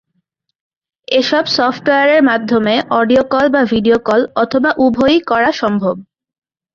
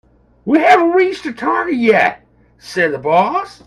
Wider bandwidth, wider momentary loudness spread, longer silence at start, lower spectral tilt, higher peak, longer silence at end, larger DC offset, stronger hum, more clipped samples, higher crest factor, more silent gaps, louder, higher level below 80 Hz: second, 7.4 kHz vs 12.5 kHz; second, 5 LU vs 8 LU; first, 1.1 s vs 0.45 s; about the same, -5.5 dB/octave vs -5.5 dB/octave; about the same, -2 dBFS vs 0 dBFS; first, 0.7 s vs 0.2 s; neither; neither; neither; about the same, 12 dB vs 14 dB; neither; about the same, -13 LUFS vs -14 LUFS; about the same, -50 dBFS vs -54 dBFS